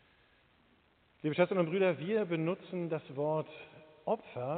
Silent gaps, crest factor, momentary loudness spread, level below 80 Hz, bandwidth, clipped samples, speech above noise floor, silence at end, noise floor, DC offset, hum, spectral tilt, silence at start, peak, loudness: none; 20 dB; 13 LU; -78 dBFS; 4.5 kHz; under 0.1%; 35 dB; 0 s; -69 dBFS; under 0.1%; none; -6 dB/octave; 1.25 s; -16 dBFS; -34 LUFS